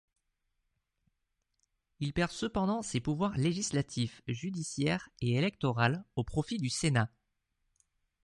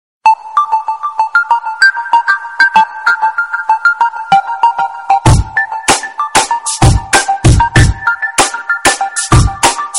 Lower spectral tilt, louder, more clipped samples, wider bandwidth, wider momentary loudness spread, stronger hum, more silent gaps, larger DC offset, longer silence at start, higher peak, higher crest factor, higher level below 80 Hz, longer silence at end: first, -5 dB/octave vs -3.5 dB/octave; second, -33 LUFS vs -11 LUFS; neither; second, 11.5 kHz vs 16.5 kHz; about the same, 7 LU vs 6 LU; neither; neither; neither; first, 2 s vs 0.25 s; second, -12 dBFS vs 0 dBFS; first, 22 dB vs 10 dB; second, -56 dBFS vs -22 dBFS; first, 1.2 s vs 0 s